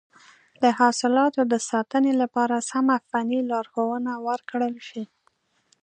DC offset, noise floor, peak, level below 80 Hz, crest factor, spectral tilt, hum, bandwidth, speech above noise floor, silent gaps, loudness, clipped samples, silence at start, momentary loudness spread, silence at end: under 0.1%; -67 dBFS; -4 dBFS; -80 dBFS; 20 dB; -3.5 dB/octave; none; 9.8 kHz; 44 dB; none; -23 LUFS; under 0.1%; 0.6 s; 9 LU; 0.8 s